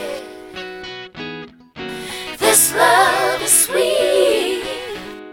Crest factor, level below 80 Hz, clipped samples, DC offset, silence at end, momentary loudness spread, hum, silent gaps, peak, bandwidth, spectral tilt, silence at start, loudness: 18 dB; -52 dBFS; under 0.1%; under 0.1%; 0 s; 19 LU; none; none; 0 dBFS; 17 kHz; -1 dB/octave; 0 s; -14 LUFS